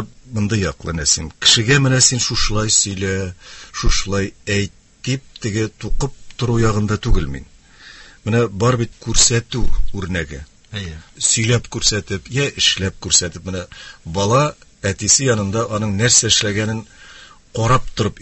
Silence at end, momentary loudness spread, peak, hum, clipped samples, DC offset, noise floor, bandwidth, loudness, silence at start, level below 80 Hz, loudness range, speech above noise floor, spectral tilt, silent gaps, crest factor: 0 s; 16 LU; 0 dBFS; none; under 0.1%; under 0.1%; -42 dBFS; 8.6 kHz; -17 LUFS; 0 s; -30 dBFS; 7 LU; 25 dB; -3 dB/octave; none; 18 dB